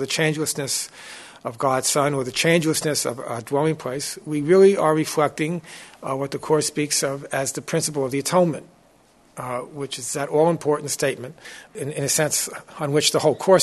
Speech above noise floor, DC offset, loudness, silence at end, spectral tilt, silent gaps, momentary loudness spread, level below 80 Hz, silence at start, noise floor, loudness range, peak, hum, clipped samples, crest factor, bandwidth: 34 dB; under 0.1%; -22 LUFS; 0 s; -4 dB/octave; none; 14 LU; -62 dBFS; 0 s; -56 dBFS; 5 LU; -2 dBFS; none; under 0.1%; 20 dB; 12.5 kHz